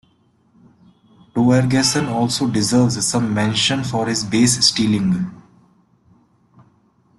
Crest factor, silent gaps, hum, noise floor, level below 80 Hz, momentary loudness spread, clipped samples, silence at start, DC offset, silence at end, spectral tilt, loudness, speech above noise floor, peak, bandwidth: 18 dB; none; none; -58 dBFS; -50 dBFS; 6 LU; under 0.1%; 1.35 s; under 0.1%; 1.8 s; -4 dB/octave; -17 LUFS; 42 dB; -2 dBFS; 12.5 kHz